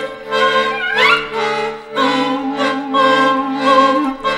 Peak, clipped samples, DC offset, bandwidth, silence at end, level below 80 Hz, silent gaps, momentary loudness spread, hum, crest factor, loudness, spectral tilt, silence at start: 0 dBFS; under 0.1%; under 0.1%; 14 kHz; 0 s; -52 dBFS; none; 7 LU; none; 16 dB; -14 LUFS; -3.5 dB/octave; 0 s